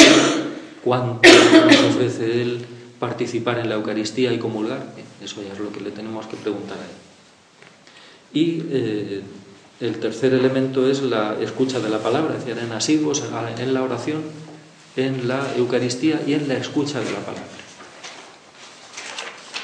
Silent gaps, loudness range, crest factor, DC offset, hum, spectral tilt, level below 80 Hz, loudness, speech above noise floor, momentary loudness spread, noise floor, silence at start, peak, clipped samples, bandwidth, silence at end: none; 13 LU; 20 dB; under 0.1%; none; -4 dB/octave; -62 dBFS; -19 LUFS; 31 dB; 21 LU; -51 dBFS; 0 s; 0 dBFS; under 0.1%; 11 kHz; 0 s